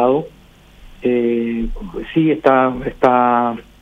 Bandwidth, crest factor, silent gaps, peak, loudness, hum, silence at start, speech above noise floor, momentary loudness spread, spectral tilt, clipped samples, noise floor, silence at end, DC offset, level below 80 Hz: 7.2 kHz; 16 dB; none; 0 dBFS; -17 LUFS; none; 0 s; 29 dB; 11 LU; -8 dB/octave; under 0.1%; -45 dBFS; 0.2 s; under 0.1%; -36 dBFS